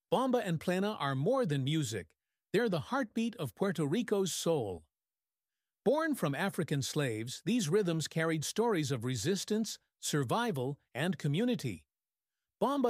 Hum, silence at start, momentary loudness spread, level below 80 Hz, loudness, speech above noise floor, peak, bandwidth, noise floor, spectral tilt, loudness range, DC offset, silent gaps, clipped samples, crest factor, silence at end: none; 0.1 s; 6 LU; -72 dBFS; -34 LUFS; over 57 dB; -18 dBFS; 16 kHz; under -90 dBFS; -5 dB/octave; 2 LU; under 0.1%; none; under 0.1%; 16 dB; 0 s